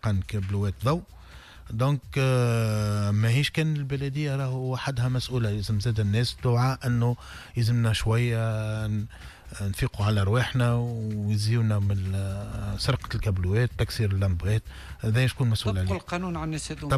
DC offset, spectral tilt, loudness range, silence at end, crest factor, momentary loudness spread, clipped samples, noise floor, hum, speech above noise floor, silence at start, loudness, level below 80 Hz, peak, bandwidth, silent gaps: under 0.1%; -6.5 dB/octave; 2 LU; 0 s; 12 dB; 8 LU; under 0.1%; -46 dBFS; none; 21 dB; 0.05 s; -27 LUFS; -42 dBFS; -14 dBFS; 13.5 kHz; none